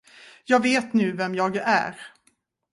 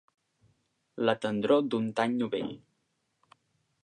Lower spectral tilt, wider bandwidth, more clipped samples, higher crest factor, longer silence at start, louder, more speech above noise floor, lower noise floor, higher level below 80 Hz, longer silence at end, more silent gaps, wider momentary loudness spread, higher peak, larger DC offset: second, -5 dB/octave vs -6.5 dB/octave; first, 11.5 kHz vs 10 kHz; neither; about the same, 18 dB vs 22 dB; second, 0.5 s vs 0.95 s; first, -23 LUFS vs -29 LUFS; second, 44 dB vs 49 dB; second, -67 dBFS vs -77 dBFS; about the same, -70 dBFS vs -74 dBFS; second, 0.65 s vs 1.25 s; neither; about the same, 15 LU vs 15 LU; first, -6 dBFS vs -10 dBFS; neither